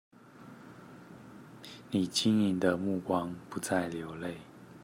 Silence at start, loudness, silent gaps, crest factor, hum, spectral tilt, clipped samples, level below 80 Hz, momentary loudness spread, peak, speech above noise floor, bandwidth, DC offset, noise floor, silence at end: 0.35 s; -32 LUFS; none; 20 dB; none; -5 dB/octave; under 0.1%; -72 dBFS; 24 LU; -14 dBFS; 22 dB; 16 kHz; under 0.1%; -53 dBFS; 0 s